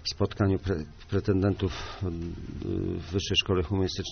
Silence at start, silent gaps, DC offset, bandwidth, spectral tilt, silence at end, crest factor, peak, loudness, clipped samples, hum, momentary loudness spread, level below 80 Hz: 0 s; none; under 0.1%; 6.6 kHz; -5 dB/octave; 0 s; 16 dB; -12 dBFS; -29 LUFS; under 0.1%; none; 9 LU; -44 dBFS